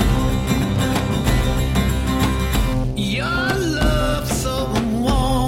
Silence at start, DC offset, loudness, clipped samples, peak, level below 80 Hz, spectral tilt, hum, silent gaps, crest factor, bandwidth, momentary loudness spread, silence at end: 0 s; under 0.1%; -20 LUFS; under 0.1%; -6 dBFS; -24 dBFS; -5.5 dB/octave; none; none; 12 dB; 17 kHz; 3 LU; 0 s